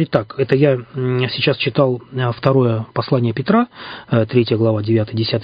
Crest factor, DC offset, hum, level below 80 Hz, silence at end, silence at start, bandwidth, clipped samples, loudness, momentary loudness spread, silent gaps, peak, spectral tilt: 16 dB; under 0.1%; none; -50 dBFS; 0 s; 0 s; 5.2 kHz; under 0.1%; -17 LUFS; 6 LU; none; 0 dBFS; -10 dB/octave